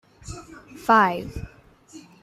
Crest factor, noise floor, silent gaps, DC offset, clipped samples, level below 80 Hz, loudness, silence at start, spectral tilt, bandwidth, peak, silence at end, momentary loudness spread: 20 dB; -50 dBFS; none; under 0.1%; under 0.1%; -46 dBFS; -21 LUFS; 0.25 s; -5 dB/octave; 15 kHz; -6 dBFS; 0.25 s; 24 LU